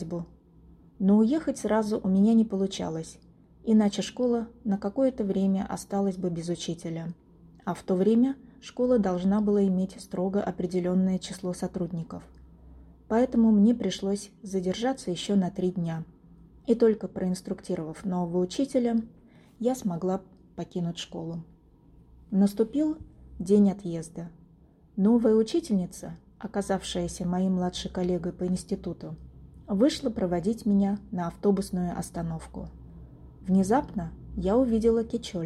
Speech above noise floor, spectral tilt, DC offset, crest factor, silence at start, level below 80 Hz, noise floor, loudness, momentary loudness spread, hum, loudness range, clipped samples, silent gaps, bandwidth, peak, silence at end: 30 dB; -7 dB/octave; under 0.1%; 16 dB; 0 s; -52 dBFS; -57 dBFS; -27 LUFS; 16 LU; none; 4 LU; under 0.1%; none; 13 kHz; -12 dBFS; 0 s